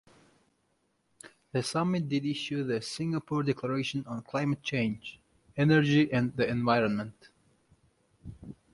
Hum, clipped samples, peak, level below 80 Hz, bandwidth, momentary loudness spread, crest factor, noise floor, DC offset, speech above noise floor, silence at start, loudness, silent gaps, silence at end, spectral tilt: none; under 0.1%; -10 dBFS; -62 dBFS; 11.5 kHz; 17 LU; 20 dB; -74 dBFS; under 0.1%; 45 dB; 1.25 s; -29 LUFS; none; 0.2 s; -6 dB/octave